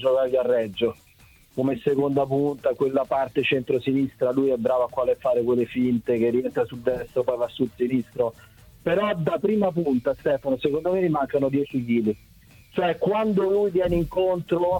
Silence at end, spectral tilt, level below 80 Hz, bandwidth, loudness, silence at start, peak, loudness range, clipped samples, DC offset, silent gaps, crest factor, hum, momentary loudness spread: 0 s; -8 dB/octave; -50 dBFS; 18 kHz; -24 LUFS; 0 s; -8 dBFS; 2 LU; under 0.1%; under 0.1%; none; 16 dB; none; 5 LU